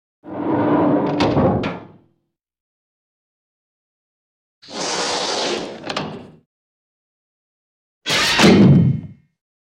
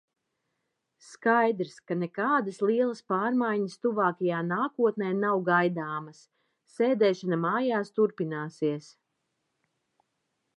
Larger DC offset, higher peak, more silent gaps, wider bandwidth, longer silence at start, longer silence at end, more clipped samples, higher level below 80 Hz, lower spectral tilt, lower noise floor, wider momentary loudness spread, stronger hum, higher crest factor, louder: neither; first, -2 dBFS vs -10 dBFS; first, 2.60-4.62 s, 6.46-8.01 s vs none; first, 16.5 kHz vs 10.5 kHz; second, 0.25 s vs 1.05 s; second, 0.55 s vs 1.75 s; neither; first, -48 dBFS vs -84 dBFS; second, -5 dB/octave vs -7 dB/octave; second, -70 dBFS vs -81 dBFS; first, 19 LU vs 9 LU; neither; about the same, 18 dB vs 20 dB; first, -17 LUFS vs -28 LUFS